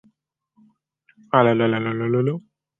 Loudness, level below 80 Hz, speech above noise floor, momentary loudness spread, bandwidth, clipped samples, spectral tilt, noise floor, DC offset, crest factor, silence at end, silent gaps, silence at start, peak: -20 LUFS; -66 dBFS; 50 dB; 8 LU; 3.9 kHz; under 0.1%; -9.5 dB/octave; -69 dBFS; under 0.1%; 22 dB; 0.4 s; none; 1.35 s; -2 dBFS